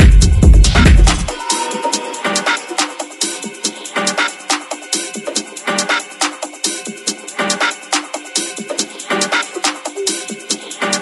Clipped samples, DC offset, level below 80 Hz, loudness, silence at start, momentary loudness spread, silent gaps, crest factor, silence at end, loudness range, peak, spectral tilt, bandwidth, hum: under 0.1%; under 0.1%; -18 dBFS; -16 LUFS; 0 s; 11 LU; none; 14 dB; 0 s; 5 LU; 0 dBFS; -3.5 dB/octave; 12 kHz; none